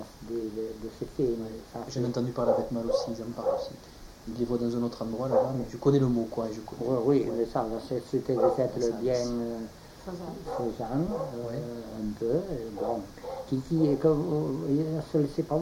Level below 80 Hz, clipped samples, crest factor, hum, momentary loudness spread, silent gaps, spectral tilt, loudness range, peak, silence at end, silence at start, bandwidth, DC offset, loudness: -52 dBFS; under 0.1%; 18 dB; none; 13 LU; none; -7.5 dB/octave; 5 LU; -12 dBFS; 0 s; 0 s; 17 kHz; under 0.1%; -30 LUFS